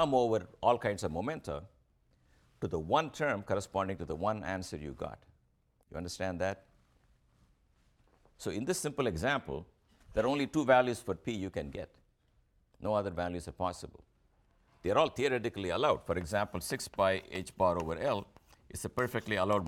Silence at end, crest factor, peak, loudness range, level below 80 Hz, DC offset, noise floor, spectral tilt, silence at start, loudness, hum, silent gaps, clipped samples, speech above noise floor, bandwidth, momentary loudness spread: 0 s; 22 dB; -12 dBFS; 7 LU; -58 dBFS; under 0.1%; -72 dBFS; -5 dB/octave; 0 s; -34 LUFS; none; none; under 0.1%; 39 dB; 17.5 kHz; 13 LU